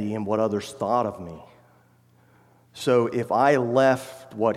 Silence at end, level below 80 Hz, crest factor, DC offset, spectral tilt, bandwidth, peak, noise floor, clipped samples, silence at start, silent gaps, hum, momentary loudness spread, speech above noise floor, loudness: 0 s; -66 dBFS; 18 dB; under 0.1%; -6 dB/octave; 15.5 kHz; -6 dBFS; -58 dBFS; under 0.1%; 0 s; none; none; 12 LU; 35 dB; -23 LUFS